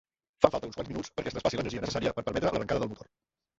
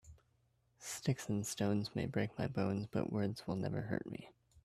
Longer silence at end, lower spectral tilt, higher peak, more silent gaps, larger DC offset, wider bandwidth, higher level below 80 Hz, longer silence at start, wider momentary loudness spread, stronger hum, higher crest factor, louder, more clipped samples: first, 0.55 s vs 0.05 s; about the same, -5.5 dB/octave vs -6 dB/octave; first, -2 dBFS vs -22 dBFS; neither; neither; second, 8 kHz vs 14.5 kHz; first, -52 dBFS vs -68 dBFS; first, 0.4 s vs 0.05 s; first, 11 LU vs 7 LU; neither; first, 30 dB vs 18 dB; first, -31 LUFS vs -39 LUFS; neither